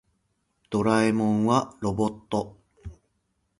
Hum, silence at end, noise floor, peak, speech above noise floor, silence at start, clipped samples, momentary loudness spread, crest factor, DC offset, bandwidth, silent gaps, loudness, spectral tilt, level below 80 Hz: none; 0.65 s; -74 dBFS; -8 dBFS; 50 dB; 0.7 s; under 0.1%; 24 LU; 20 dB; under 0.1%; 11.5 kHz; none; -25 LUFS; -6.5 dB/octave; -52 dBFS